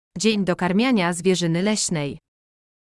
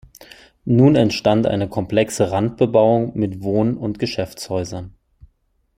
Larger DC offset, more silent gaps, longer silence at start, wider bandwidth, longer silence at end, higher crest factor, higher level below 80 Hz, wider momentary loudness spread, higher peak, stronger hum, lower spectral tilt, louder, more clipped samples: neither; neither; about the same, 0.15 s vs 0.2 s; second, 12 kHz vs 15.5 kHz; about the same, 0.85 s vs 0.9 s; about the same, 16 dB vs 18 dB; second, -56 dBFS vs -48 dBFS; second, 8 LU vs 11 LU; second, -6 dBFS vs -2 dBFS; neither; second, -4.5 dB/octave vs -6.5 dB/octave; second, -21 LUFS vs -18 LUFS; neither